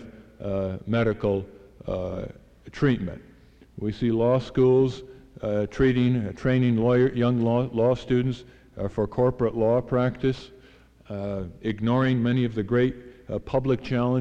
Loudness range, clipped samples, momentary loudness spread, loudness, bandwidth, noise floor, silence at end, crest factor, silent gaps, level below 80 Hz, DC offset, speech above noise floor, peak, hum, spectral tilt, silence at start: 5 LU; under 0.1%; 14 LU; -25 LUFS; 7.6 kHz; -53 dBFS; 0 s; 14 dB; none; -46 dBFS; under 0.1%; 29 dB; -10 dBFS; none; -8.5 dB/octave; 0 s